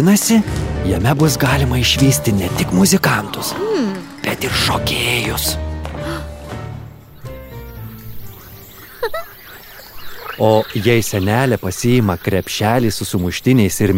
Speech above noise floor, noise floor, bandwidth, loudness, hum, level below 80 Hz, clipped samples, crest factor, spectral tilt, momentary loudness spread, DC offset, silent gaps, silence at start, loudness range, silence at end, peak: 22 dB; -37 dBFS; 16.5 kHz; -16 LUFS; none; -32 dBFS; under 0.1%; 16 dB; -4.5 dB/octave; 22 LU; 0.2%; none; 0 s; 15 LU; 0 s; -2 dBFS